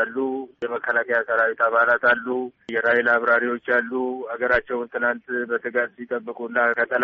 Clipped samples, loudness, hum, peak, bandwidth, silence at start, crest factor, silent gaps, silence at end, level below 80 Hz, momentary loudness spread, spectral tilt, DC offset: under 0.1%; -22 LUFS; none; -6 dBFS; 6.2 kHz; 0 s; 16 dB; none; 0 s; -58 dBFS; 10 LU; -1.5 dB/octave; under 0.1%